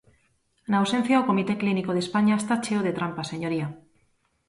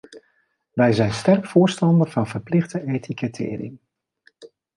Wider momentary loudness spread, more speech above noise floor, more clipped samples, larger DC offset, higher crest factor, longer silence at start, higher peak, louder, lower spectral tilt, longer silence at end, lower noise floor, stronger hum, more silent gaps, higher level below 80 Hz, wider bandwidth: second, 9 LU vs 12 LU; about the same, 44 dB vs 47 dB; neither; neither; about the same, 16 dB vs 18 dB; first, 0.7 s vs 0.1 s; second, -10 dBFS vs -4 dBFS; second, -25 LUFS vs -21 LUFS; about the same, -6 dB/octave vs -7 dB/octave; first, 0.7 s vs 0.3 s; about the same, -68 dBFS vs -67 dBFS; neither; neither; second, -66 dBFS vs -56 dBFS; about the same, 11.5 kHz vs 11.5 kHz